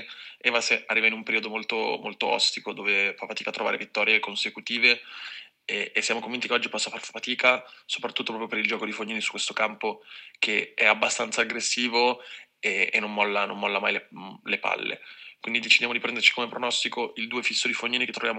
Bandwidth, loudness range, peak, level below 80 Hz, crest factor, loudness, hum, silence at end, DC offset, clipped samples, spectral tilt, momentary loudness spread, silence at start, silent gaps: 15 kHz; 3 LU; -4 dBFS; -86 dBFS; 24 dB; -25 LUFS; none; 0 s; under 0.1%; under 0.1%; -1 dB/octave; 12 LU; 0 s; none